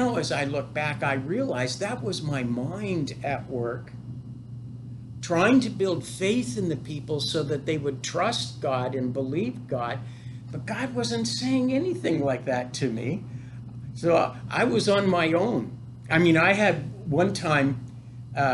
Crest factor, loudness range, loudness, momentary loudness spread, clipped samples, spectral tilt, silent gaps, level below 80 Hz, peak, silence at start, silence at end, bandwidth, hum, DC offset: 18 dB; 6 LU; -26 LUFS; 18 LU; under 0.1%; -5.5 dB/octave; none; -58 dBFS; -8 dBFS; 0 s; 0 s; 12 kHz; none; under 0.1%